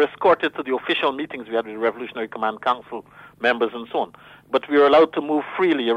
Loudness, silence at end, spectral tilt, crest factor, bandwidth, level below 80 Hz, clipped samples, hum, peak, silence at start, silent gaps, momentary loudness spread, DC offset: -21 LUFS; 0 s; -5.5 dB/octave; 16 dB; 9 kHz; -64 dBFS; under 0.1%; none; -6 dBFS; 0 s; none; 13 LU; under 0.1%